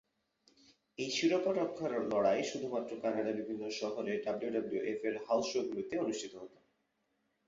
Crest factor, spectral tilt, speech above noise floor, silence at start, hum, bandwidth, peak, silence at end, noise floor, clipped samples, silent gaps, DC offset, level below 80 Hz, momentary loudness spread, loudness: 18 dB; -3.5 dB/octave; 45 dB; 1 s; none; 7.6 kHz; -18 dBFS; 1 s; -80 dBFS; under 0.1%; none; under 0.1%; -76 dBFS; 9 LU; -36 LUFS